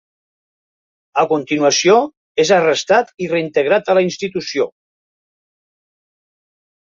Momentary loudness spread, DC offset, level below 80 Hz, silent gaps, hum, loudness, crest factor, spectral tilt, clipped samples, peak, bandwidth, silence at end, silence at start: 9 LU; under 0.1%; -64 dBFS; 2.17-2.35 s; none; -16 LUFS; 16 dB; -3.5 dB/octave; under 0.1%; -2 dBFS; 7.8 kHz; 2.25 s; 1.15 s